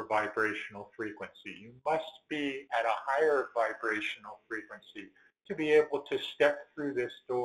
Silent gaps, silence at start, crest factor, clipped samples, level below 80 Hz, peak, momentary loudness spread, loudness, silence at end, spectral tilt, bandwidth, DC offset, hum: none; 0 s; 20 dB; under 0.1%; -74 dBFS; -14 dBFS; 16 LU; -32 LUFS; 0 s; -4.5 dB/octave; 12 kHz; under 0.1%; none